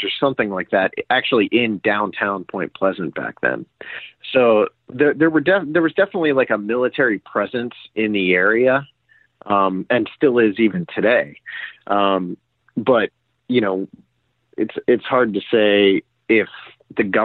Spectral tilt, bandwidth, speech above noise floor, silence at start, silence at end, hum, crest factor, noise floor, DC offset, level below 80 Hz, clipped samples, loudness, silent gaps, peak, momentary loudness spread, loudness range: -9.5 dB/octave; 4.6 kHz; 43 dB; 0 s; 0 s; none; 16 dB; -61 dBFS; under 0.1%; -64 dBFS; under 0.1%; -18 LUFS; none; -4 dBFS; 13 LU; 3 LU